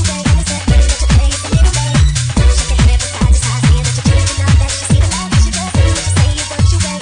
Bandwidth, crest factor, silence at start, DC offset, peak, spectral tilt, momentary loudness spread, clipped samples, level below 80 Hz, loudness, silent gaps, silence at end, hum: 10.5 kHz; 10 dB; 0 s; under 0.1%; 0 dBFS; -4.5 dB/octave; 2 LU; under 0.1%; -14 dBFS; -13 LUFS; none; 0 s; none